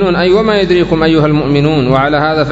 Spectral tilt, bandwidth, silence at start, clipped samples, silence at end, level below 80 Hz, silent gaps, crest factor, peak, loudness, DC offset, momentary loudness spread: -7.5 dB/octave; 7.8 kHz; 0 s; 0.2%; 0 s; -32 dBFS; none; 10 dB; 0 dBFS; -10 LUFS; under 0.1%; 1 LU